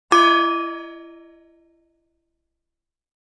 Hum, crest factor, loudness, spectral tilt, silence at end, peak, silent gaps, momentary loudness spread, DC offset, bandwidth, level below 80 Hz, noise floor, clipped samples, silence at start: none; 20 dB; -17 LUFS; -1 dB/octave; 2.2 s; -2 dBFS; none; 25 LU; under 0.1%; 11 kHz; -70 dBFS; -84 dBFS; under 0.1%; 0.1 s